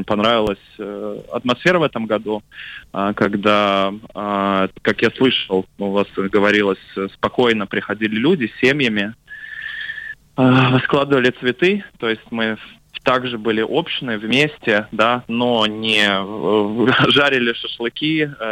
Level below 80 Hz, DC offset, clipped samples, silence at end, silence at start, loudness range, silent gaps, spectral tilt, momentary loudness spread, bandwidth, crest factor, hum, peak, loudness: -52 dBFS; under 0.1%; under 0.1%; 0 s; 0 s; 3 LU; none; -6 dB/octave; 12 LU; 16 kHz; 14 dB; none; -4 dBFS; -18 LUFS